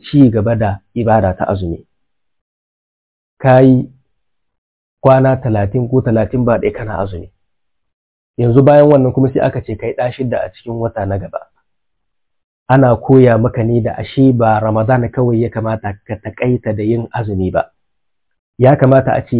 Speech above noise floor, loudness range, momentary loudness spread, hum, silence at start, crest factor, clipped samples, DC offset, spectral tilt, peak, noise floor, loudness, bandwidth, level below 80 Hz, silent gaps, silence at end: 63 dB; 6 LU; 13 LU; none; 0.05 s; 14 dB; 0.2%; under 0.1%; -12.5 dB/octave; 0 dBFS; -76 dBFS; -13 LUFS; 4 kHz; -38 dBFS; 2.41-3.37 s, 4.58-4.97 s, 7.93-8.34 s, 12.44-12.66 s, 18.39-18.53 s; 0 s